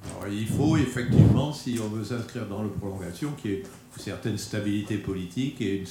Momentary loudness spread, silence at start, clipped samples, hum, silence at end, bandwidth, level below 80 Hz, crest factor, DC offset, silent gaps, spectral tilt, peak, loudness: 13 LU; 0 s; under 0.1%; none; 0 s; 16.5 kHz; -46 dBFS; 22 dB; under 0.1%; none; -6.5 dB/octave; -4 dBFS; -27 LUFS